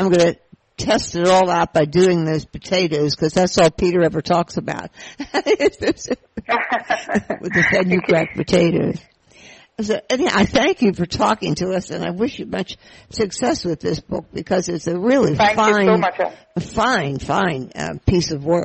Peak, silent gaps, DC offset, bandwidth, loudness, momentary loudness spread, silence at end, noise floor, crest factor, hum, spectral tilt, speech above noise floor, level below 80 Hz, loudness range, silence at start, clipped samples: -4 dBFS; none; under 0.1%; 8.6 kHz; -18 LUFS; 12 LU; 0 s; -46 dBFS; 16 dB; none; -5 dB/octave; 28 dB; -44 dBFS; 4 LU; 0 s; under 0.1%